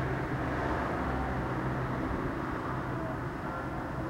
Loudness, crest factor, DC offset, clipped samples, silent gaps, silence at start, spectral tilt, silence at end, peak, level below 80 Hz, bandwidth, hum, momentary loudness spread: -34 LUFS; 14 dB; under 0.1%; under 0.1%; none; 0 s; -7.5 dB/octave; 0 s; -20 dBFS; -44 dBFS; 15.5 kHz; none; 4 LU